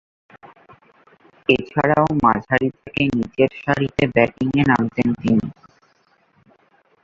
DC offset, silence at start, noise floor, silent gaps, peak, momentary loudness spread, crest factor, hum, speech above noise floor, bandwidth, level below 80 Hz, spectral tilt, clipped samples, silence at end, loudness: under 0.1%; 1.5 s; -60 dBFS; none; -2 dBFS; 4 LU; 20 dB; none; 42 dB; 7.6 kHz; -48 dBFS; -7.5 dB/octave; under 0.1%; 1.5 s; -19 LUFS